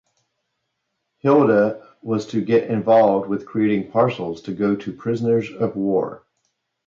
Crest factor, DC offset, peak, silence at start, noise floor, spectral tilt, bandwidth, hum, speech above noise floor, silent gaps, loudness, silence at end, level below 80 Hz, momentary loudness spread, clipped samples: 16 dB; under 0.1%; -4 dBFS; 1.25 s; -76 dBFS; -8 dB/octave; 7.4 kHz; none; 57 dB; none; -20 LUFS; 0.7 s; -62 dBFS; 10 LU; under 0.1%